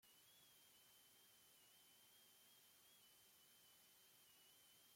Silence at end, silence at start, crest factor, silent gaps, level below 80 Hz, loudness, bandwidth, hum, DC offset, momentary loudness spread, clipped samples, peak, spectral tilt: 0 s; 0 s; 14 dB; none; under -90 dBFS; -69 LUFS; 16.5 kHz; none; under 0.1%; 1 LU; under 0.1%; -58 dBFS; -0.5 dB/octave